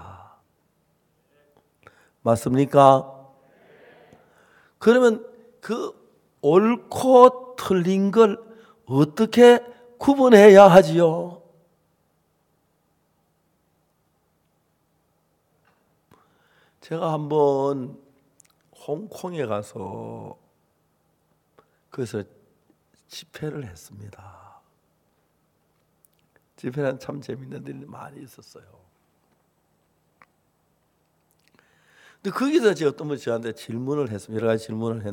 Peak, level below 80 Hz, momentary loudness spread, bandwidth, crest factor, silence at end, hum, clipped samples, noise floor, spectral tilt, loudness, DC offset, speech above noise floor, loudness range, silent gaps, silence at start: 0 dBFS; -64 dBFS; 24 LU; 17 kHz; 22 dB; 0 s; none; under 0.1%; -68 dBFS; -6.5 dB/octave; -19 LUFS; under 0.1%; 49 dB; 23 LU; none; 0.05 s